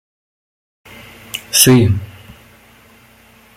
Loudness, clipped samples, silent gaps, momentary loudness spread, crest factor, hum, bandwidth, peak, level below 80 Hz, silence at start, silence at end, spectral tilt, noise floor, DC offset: -11 LUFS; under 0.1%; none; 19 LU; 18 dB; none; 17 kHz; 0 dBFS; -48 dBFS; 1.35 s; 1.5 s; -4 dB/octave; -47 dBFS; under 0.1%